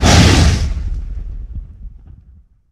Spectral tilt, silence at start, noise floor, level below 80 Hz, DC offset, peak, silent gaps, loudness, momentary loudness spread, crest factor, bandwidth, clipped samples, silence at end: -4.5 dB/octave; 0 s; -46 dBFS; -20 dBFS; under 0.1%; 0 dBFS; none; -13 LUFS; 23 LU; 14 dB; 14.5 kHz; under 0.1%; 0.8 s